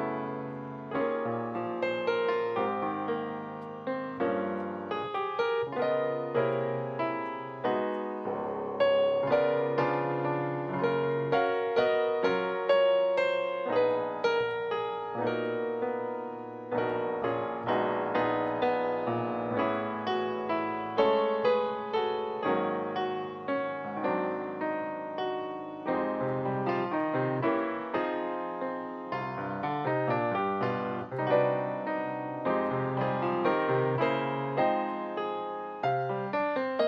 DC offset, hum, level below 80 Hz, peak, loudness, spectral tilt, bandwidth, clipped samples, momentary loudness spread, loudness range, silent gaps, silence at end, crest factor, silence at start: under 0.1%; none; -72 dBFS; -12 dBFS; -30 LUFS; -8 dB/octave; 6.6 kHz; under 0.1%; 8 LU; 4 LU; none; 0 s; 18 dB; 0 s